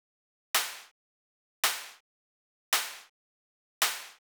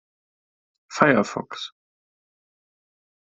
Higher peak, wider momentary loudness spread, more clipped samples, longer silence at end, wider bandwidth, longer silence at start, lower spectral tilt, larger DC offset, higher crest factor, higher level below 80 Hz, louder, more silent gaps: second, -12 dBFS vs -2 dBFS; about the same, 16 LU vs 18 LU; neither; second, 0.2 s vs 1.55 s; first, over 20 kHz vs 8.2 kHz; second, 0.55 s vs 0.9 s; second, 3 dB/octave vs -5 dB/octave; neither; about the same, 24 dB vs 26 dB; second, under -90 dBFS vs -66 dBFS; second, -31 LUFS vs -21 LUFS; first, 0.91-1.63 s, 2.00-2.72 s, 3.09-3.81 s vs none